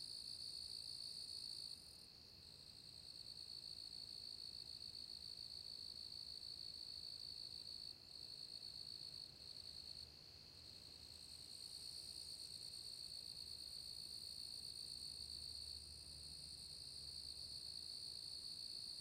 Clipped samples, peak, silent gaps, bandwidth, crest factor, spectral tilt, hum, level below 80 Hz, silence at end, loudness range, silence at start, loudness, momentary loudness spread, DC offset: under 0.1%; -40 dBFS; none; 16 kHz; 14 dB; -1 dB/octave; none; -74 dBFS; 0 s; 3 LU; 0 s; -51 LUFS; 7 LU; under 0.1%